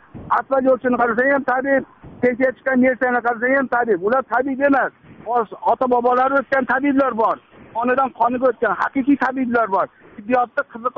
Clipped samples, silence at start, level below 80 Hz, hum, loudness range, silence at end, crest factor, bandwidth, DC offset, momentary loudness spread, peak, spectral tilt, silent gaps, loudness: under 0.1%; 0.15 s; -56 dBFS; none; 1 LU; 0.05 s; 14 dB; 5.6 kHz; under 0.1%; 6 LU; -6 dBFS; -4.5 dB/octave; none; -19 LUFS